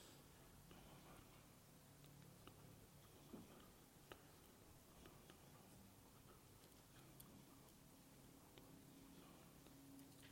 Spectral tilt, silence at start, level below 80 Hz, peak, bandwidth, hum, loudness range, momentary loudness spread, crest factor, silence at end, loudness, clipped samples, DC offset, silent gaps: -4 dB/octave; 0 s; -78 dBFS; -38 dBFS; 16.5 kHz; none; 1 LU; 3 LU; 28 dB; 0 s; -65 LUFS; under 0.1%; under 0.1%; none